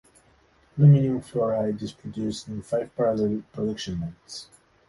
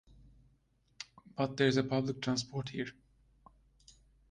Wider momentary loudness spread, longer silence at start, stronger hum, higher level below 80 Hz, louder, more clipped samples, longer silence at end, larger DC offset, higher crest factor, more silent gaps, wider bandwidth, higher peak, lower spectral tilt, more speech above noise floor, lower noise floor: about the same, 18 LU vs 19 LU; second, 0.75 s vs 1 s; neither; first, -54 dBFS vs -66 dBFS; first, -25 LUFS vs -34 LUFS; neither; second, 0.45 s vs 1.4 s; neither; about the same, 18 dB vs 22 dB; neither; first, 11.5 kHz vs 9.8 kHz; first, -6 dBFS vs -16 dBFS; first, -8 dB/octave vs -5.5 dB/octave; about the same, 36 dB vs 39 dB; second, -60 dBFS vs -72 dBFS